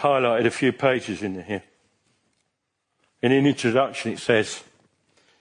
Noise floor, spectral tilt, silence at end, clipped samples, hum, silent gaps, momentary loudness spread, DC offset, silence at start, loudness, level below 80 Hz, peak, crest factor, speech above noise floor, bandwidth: -77 dBFS; -5.5 dB/octave; 0.8 s; under 0.1%; none; none; 12 LU; under 0.1%; 0 s; -23 LUFS; -68 dBFS; -4 dBFS; 20 dB; 55 dB; 10.5 kHz